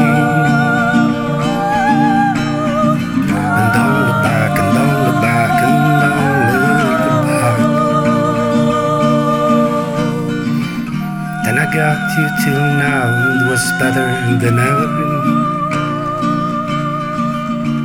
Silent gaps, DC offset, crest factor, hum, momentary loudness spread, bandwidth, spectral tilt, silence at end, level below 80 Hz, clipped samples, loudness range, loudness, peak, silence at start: none; under 0.1%; 12 dB; none; 6 LU; 18 kHz; -6 dB/octave; 0 s; -42 dBFS; under 0.1%; 3 LU; -14 LUFS; -2 dBFS; 0 s